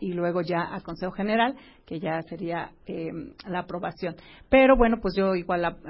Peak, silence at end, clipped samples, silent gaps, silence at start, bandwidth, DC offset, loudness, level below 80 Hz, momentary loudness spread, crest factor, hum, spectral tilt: -6 dBFS; 0 s; under 0.1%; none; 0 s; 5.8 kHz; under 0.1%; -26 LUFS; -44 dBFS; 16 LU; 18 dB; none; -10.5 dB/octave